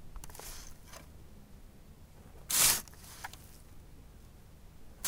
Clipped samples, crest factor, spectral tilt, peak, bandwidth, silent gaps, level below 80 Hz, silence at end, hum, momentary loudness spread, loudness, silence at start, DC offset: under 0.1%; 28 dB; 0 dB/octave; -12 dBFS; 18 kHz; none; -54 dBFS; 0 s; none; 29 LU; -27 LUFS; 0 s; under 0.1%